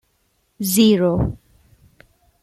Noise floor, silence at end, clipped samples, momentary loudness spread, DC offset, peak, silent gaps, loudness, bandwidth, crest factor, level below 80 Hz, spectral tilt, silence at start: -65 dBFS; 1.1 s; under 0.1%; 12 LU; under 0.1%; -2 dBFS; none; -17 LUFS; 16 kHz; 18 dB; -40 dBFS; -5.5 dB/octave; 0.6 s